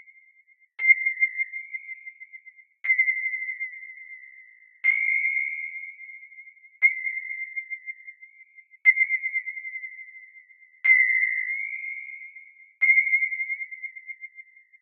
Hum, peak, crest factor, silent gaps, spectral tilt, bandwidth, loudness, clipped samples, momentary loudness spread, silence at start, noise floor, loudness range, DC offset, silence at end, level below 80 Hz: none; -6 dBFS; 22 dB; none; 8.5 dB/octave; 3.7 kHz; -23 LUFS; under 0.1%; 23 LU; 0.8 s; -60 dBFS; 5 LU; under 0.1%; 0.4 s; under -90 dBFS